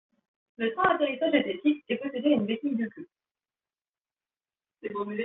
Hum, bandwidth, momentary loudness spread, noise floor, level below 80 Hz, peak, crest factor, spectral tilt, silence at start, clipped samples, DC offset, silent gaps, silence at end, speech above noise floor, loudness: none; 3.9 kHz; 11 LU; under -90 dBFS; -70 dBFS; -10 dBFS; 20 dB; -3.5 dB/octave; 0.6 s; under 0.1%; under 0.1%; none; 0 s; over 63 dB; -28 LUFS